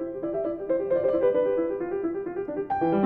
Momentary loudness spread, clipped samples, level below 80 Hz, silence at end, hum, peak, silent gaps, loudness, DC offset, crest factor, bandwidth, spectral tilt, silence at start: 8 LU; under 0.1%; -58 dBFS; 0 s; none; -12 dBFS; none; -27 LUFS; under 0.1%; 14 dB; 4.2 kHz; -10.5 dB/octave; 0 s